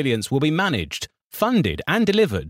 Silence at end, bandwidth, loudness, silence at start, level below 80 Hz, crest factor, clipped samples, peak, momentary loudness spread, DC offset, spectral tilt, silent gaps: 0 s; 16.5 kHz; -21 LUFS; 0 s; -46 dBFS; 14 dB; under 0.1%; -6 dBFS; 11 LU; under 0.1%; -5.5 dB/octave; 1.24-1.30 s